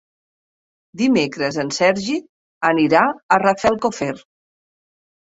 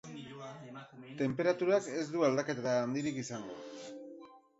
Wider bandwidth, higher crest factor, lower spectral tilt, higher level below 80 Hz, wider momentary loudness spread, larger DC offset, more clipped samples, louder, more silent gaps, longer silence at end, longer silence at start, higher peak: about the same, 8 kHz vs 8 kHz; about the same, 20 dB vs 18 dB; about the same, -4.5 dB/octave vs -5.5 dB/octave; first, -58 dBFS vs -76 dBFS; second, 11 LU vs 19 LU; neither; neither; first, -18 LUFS vs -34 LUFS; first, 2.29-2.61 s, 3.23-3.29 s vs none; first, 1 s vs 0.2 s; first, 0.95 s vs 0.05 s; first, 0 dBFS vs -18 dBFS